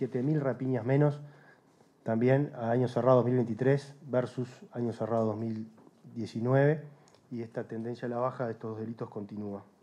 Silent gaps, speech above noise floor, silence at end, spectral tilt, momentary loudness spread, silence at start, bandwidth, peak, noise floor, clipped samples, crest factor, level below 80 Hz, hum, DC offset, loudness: none; 33 dB; 0.2 s; -9 dB/octave; 14 LU; 0 s; 10 kHz; -12 dBFS; -63 dBFS; under 0.1%; 20 dB; -80 dBFS; none; under 0.1%; -31 LUFS